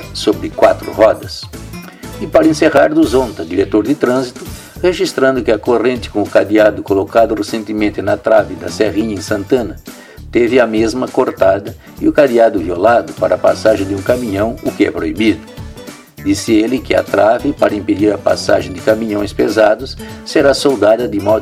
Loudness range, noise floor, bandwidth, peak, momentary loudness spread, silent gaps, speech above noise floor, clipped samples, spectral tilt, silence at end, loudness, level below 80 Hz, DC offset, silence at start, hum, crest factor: 2 LU; -33 dBFS; 16 kHz; 0 dBFS; 14 LU; none; 20 dB; under 0.1%; -5.5 dB/octave; 0 s; -13 LUFS; -38 dBFS; under 0.1%; 0 s; none; 14 dB